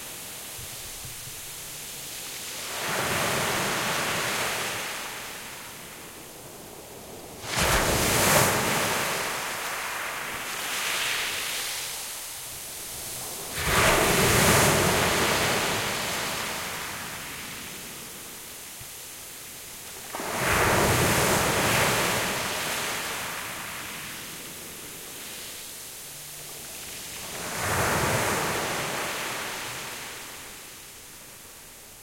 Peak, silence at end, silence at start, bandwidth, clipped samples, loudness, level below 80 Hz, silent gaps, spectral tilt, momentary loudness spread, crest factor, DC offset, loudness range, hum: -6 dBFS; 0 s; 0 s; 16.5 kHz; under 0.1%; -26 LUFS; -46 dBFS; none; -2.5 dB/octave; 17 LU; 22 dB; under 0.1%; 12 LU; none